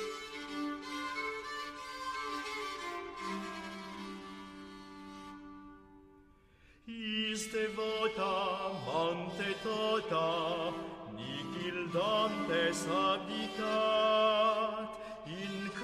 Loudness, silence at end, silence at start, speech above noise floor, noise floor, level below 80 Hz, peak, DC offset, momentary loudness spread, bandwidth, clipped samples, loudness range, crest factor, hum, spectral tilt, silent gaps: -35 LUFS; 0 s; 0 s; 30 dB; -63 dBFS; -66 dBFS; -20 dBFS; under 0.1%; 17 LU; 15 kHz; under 0.1%; 13 LU; 18 dB; none; -4 dB/octave; none